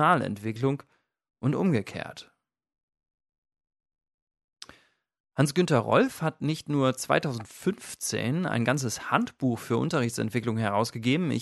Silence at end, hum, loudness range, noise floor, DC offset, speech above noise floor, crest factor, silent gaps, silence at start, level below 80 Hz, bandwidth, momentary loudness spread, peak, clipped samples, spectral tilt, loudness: 0 s; none; 8 LU; -62 dBFS; under 0.1%; 35 dB; 22 dB; 2.83-2.88 s, 3.38-3.42 s, 4.14-4.27 s, 4.44-4.48 s, 5.20-5.24 s; 0 s; -66 dBFS; 12 kHz; 12 LU; -6 dBFS; under 0.1%; -5.5 dB/octave; -27 LUFS